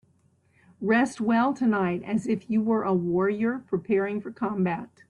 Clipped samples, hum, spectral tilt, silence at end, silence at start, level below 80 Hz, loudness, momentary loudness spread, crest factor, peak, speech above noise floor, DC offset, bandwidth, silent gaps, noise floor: under 0.1%; none; -7.5 dB/octave; 0.25 s; 0.8 s; -66 dBFS; -26 LUFS; 7 LU; 16 dB; -10 dBFS; 39 dB; under 0.1%; 11 kHz; none; -65 dBFS